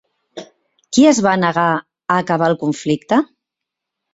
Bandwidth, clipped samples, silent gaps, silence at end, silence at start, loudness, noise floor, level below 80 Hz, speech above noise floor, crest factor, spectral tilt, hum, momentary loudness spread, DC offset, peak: 8 kHz; under 0.1%; none; 0.9 s; 0.35 s; -16 LUFS; -82 dBFS; -58 dBFS; 67 dB; 16 dB; -5 dB/octave; none; 18 LU; under 0.1%; 0 dBFS